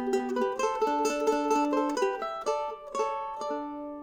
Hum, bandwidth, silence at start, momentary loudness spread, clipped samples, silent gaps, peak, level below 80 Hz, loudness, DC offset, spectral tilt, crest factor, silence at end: none; 19.5 kHz; 0 s; 8 LU; under 0.1%; none; -14 dBFS; -62 dBFS; -29 LUFS; under 0.1%; -3 dB/octave; 14 dB; 0 s